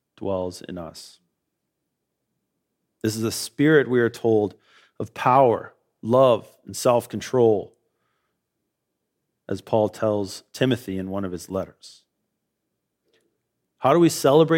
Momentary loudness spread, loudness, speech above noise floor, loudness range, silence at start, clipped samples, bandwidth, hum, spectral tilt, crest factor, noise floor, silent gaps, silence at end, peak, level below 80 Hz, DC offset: 18 LU; -22 LUFS; 58 dB; 9 LU; 0.2 s; under 0.1%; 16.5 kHz; none; -5.5 dB/octave; 20 dB; -79 dBFS; none; 0 s; -4 dBFS; -64 dBFS; under 0.1%